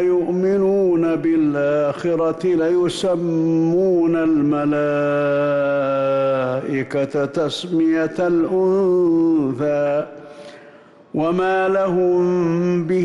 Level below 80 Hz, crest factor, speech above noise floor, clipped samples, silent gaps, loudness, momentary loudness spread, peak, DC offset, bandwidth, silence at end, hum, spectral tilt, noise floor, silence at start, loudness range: -56 dBFS; 8 dB; 28 dB; under 0.1%; none; -18 LUFS; 5 LU; -10 dBFS; under 0.1%; 11.5 kHz; 0 s; none; -7.5 dB/octave; -45 dBFS; 0 s; 2 LU